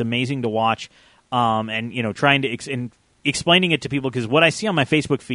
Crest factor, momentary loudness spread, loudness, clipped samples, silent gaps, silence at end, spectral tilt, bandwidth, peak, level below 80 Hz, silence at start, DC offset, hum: 20 dB; 11 LU; -20 LUFS; under 0.1%; none; 0 s; -4.5 dB/octave; 11 kHz; -2 dBFS; -56 dBFS; 0 s; under 0.1%; none